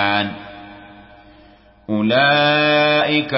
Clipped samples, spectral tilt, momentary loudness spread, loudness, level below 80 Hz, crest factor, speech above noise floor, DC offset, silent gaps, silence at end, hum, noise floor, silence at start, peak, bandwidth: under 0.1%; -9 dB/octave; 21 LU; -15 LUFS; -54 dBFS; 14 dB; 32 dB; under 0.1%; none; 0 s; none; -48 dBFS; 0 s; -4 dBFS; 5.8 kHz